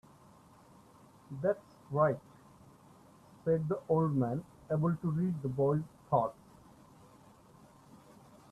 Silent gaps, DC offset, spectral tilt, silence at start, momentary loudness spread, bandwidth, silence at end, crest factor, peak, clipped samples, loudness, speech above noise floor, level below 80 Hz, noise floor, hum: none; under 0.1%; -10 dB/octave; 1.3 s; 9 LU; 12 kHz; 0.55 s; 20 dB; -16 dBFS; under 0.1%; -33 LUFS; 28 dB; -68 dBFS; -60 dBFS; none